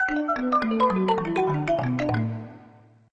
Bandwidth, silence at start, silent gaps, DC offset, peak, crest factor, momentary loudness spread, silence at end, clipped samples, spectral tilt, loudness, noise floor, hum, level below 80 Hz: 8.8 kHz; 0 s; none; under 0.1%; -10 dBFS; 16 dB; 8 LU; 0.5 s; under 0.1%; -7.5 dB/octave; -24 LUFS; -52 dBFS; none; -52 dBFS